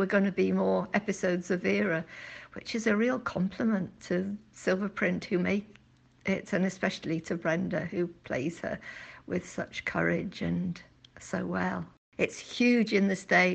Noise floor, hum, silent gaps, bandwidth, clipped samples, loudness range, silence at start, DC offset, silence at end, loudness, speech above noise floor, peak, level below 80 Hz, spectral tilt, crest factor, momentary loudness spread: -57 dBFS; none; 11.98-12.12 s; 8.6 kHz; under 0.1%; 4 LU; 0 s; under 0.1%; 0 s; -30 LUFS; 27 dB; -10 dBFS; -62 dBFS; -6 dB/octave; 20 dB; 11 LU